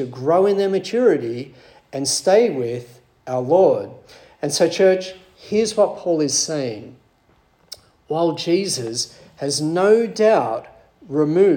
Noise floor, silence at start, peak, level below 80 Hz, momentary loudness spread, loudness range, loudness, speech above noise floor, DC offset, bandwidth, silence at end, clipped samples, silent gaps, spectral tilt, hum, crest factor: -58 dBFS; 0 s; -2 dBFS; -64 dBFS; 16 LU; 4 LU; -19 LUFS; 40 dB; under 0.1%; 17.5 kHz; 0 s; under 0.1%; none; -4 dB/octave; none; 16 dB